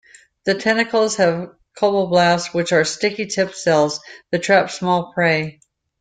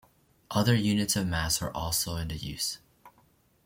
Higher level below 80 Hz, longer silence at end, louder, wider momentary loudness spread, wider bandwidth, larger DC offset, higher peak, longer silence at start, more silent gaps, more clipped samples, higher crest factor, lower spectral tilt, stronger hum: second, -60 dBFS vs -48 dBFS; about the same, 0.5 s vs 0.55 s; first, -18 LUFS vs -29 LUFS; about the same, 9 LU vs 9 LU; second, 9.4 kHz vs 16.5 kHz; neither; first, -2 dBFS vs -10 dBFS; about the same, 0.45 s vs 0.5 s; neither; neither; about the same, 16 dB vs 20 dB; about the same, -4 dB/octave vs -4 dB/octave; neither